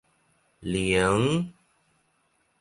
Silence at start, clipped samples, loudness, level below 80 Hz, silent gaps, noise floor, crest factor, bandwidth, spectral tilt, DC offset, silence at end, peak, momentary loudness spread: 0.6 s; under 0.1%; -25 LUFS; -50 dBFS; none; -70 dBFS; 18 dB; 11.5 kHz; -5.5 dB/octave; under 0.1%; 1.1 s; -10 dBFS; 15 LU